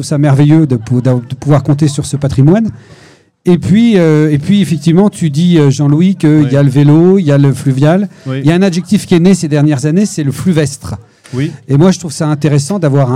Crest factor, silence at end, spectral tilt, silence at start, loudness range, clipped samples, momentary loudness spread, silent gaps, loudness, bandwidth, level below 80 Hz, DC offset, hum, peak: 10 dB; 0 s; -7 dB/octave; 0 s; 4 LU; 1%; 8 LU; none; -10 LUFS; 12.5 kHz; -42 dBFS; 0.4%; none; 0 dBFS